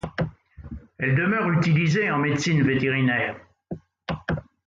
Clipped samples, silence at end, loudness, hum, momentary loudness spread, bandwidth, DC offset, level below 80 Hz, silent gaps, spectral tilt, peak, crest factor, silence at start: under 0.1%; 0.25 s; -23 LUFS; none; 19 LU; 7.6 kHz; under 0.1%; -48 dBFS; none; -6.5 dB/octave; -10 dBFS; 14 dB; 0.05 s